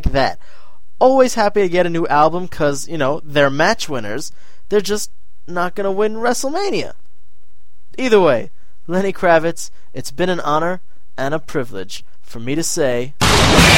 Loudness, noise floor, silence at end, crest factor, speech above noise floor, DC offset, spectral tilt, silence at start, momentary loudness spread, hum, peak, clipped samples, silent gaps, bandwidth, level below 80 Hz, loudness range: -17 LUFS; -55 dBFS; 0 s; 18 dB; 38 dB; 8%; -4 dB/octave; 0.05 s; 17 LU; none; 0 dBFS; under 0.1%; none; 16.5 kHz; -32 dBFS; 5 LU